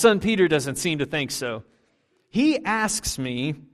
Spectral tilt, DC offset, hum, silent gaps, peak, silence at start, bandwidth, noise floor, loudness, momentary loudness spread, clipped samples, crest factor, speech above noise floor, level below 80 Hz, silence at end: -4 dB/octave; under 0.1%; none; none; -4 dBFS; 0 s; 15 kHz; -67 dBFS; -23 LUFS; 9 LU; under 0.1%; 20 dB; 44 dB; -50 dBFS; 0.15 s